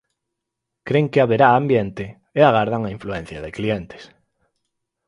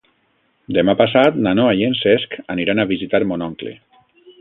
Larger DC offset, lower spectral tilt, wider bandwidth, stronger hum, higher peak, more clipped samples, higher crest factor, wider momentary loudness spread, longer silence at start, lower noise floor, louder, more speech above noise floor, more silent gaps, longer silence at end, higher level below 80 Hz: neither; about the same, -8 dB/octave vs -8.5 dB/octave; first, 11 kHz vs 5 kHz; neither; about the same, 0 dBFS vs 0 dBFS; neither; about the same, 20 dB vs 18 dB; first, 17 LU vs 11 LU; first, 0.85 s vs 0.7 s; first, -81 dBFS vs -63 dBFS; about the same, -19 LUFS vs -17 LUFS; first, 63 dB vs 46 dB; neither; first, 1 s vs 0.65 s; about the same, -50 dBFS vs -52 dBFS